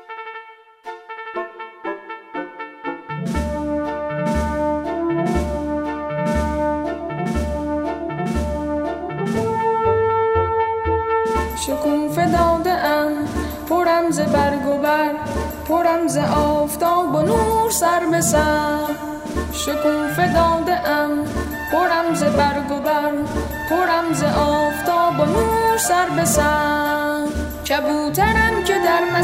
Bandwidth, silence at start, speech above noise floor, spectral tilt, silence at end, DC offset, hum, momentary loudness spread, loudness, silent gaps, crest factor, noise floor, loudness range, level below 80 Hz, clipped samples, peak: 16 kHz; 0.1 s; 24 dB; -5 dB/octave; 0 s; under 0.1%; none; 10 LU; -19 LUFS; none; 16 dB; -41 dBFS; 5 LU; -34 dBFS; under 0.1%; -4 dBFS